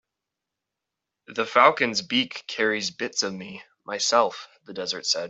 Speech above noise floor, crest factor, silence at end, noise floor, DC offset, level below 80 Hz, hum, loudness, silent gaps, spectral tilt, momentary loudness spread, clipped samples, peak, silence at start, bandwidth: 61 dB; 24 dB; 0 s; -86 dBFS; under 0.1%; -74 dBFS; none; -23 LUFS; none; -2 dB/octave; 19 LU; under 0.1%; -2 dBFS; 1.3 s; 8.2 kHz